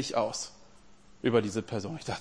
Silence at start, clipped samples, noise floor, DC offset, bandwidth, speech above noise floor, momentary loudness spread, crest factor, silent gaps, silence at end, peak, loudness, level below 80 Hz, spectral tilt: 0 s; under 0.1%; -58 dBFS; 0.2%; 10.5 kHz; 28 dB; 10 LU; 22 dB; none; 0 s; -10 dBFS; -32 LUFS; -62 dBFS; -4.5 dB/octave